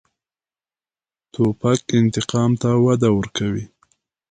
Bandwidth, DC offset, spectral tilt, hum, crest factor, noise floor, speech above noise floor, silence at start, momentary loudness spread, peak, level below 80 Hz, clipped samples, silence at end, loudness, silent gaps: 9.4 kHz; under 0.1%; -6.5 dB/octave; none; 16 dB; under -90 dBFS; over 72 dB; 1.4 s; 10 LU; -4 dBFS; -50 dBFS; under 0.1%; 0.65 s; -19 LUFS; none